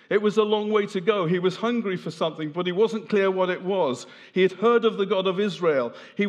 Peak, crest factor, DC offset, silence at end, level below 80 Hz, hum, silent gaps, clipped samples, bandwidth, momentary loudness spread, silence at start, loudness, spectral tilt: -6 dBFS; 18 dB; under 0.1%; 0 s; -88 dBFS; none; none; under 0.1%; 9.8 kHz; 7 LU; 0.1 s; -24 LUFS; -6 dB/octave